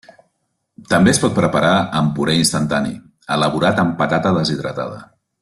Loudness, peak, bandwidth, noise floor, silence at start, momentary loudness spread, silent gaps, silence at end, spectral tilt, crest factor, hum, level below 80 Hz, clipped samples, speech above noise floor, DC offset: -17 LUFS; 0 dBFS; 12.5 kHz; -70 dBFS; 0.8 s; 12 LU; none; 0.4 s; -5 dB/octave; 16 dB; none; -48 dBFS; under 0.1%; 54 dB; under 0.1%